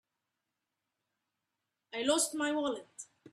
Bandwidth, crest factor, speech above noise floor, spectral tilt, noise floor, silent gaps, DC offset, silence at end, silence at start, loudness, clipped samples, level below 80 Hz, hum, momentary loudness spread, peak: 14 kHz; 20 dB; 54 dB; -1 dB/octave; -87 dBFS; none; under 0.1%; 0.05 s; 1.95 s; -33 LUFS; under 0.1%; -80 dBFS; none; 18 LU; -18 dBFS